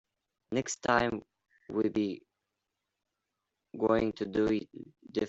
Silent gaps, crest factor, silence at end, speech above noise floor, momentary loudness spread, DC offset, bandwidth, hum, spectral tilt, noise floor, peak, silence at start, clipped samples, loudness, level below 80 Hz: none; 24 dB; 0 s; 55 dB; 17 LU; under 0.1%; 8.2 kHz; none; -5 dB/octave; -86 dBFS; -10 dBFS; 0.5 s; under 0.1%; -32 LUFS; -62 dBFS